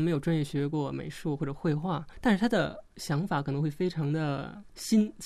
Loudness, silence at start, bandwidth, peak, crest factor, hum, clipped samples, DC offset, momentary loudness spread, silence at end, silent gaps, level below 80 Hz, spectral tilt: -30 LUFS; 0 s; 14 kHz; -12 dBFS; 18 dB; none; under 0.1%; under 0.1%; 8 LU; 0 s; none; -54 dBFS; -6.5 dB/octave